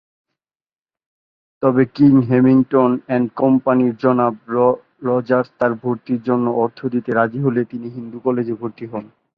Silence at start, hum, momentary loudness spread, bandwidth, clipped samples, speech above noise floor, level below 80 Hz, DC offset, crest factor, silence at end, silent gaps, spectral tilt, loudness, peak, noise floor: 1.6 s; none; 12 LU; 5.2 kHz; under 0.1%; over 73 dB; -58 dBFS; under 0.1%; 16 dB; 0.3 s; none; -11 dB/octave; -17 LUFS; -2 dBFS; under -90 dBFS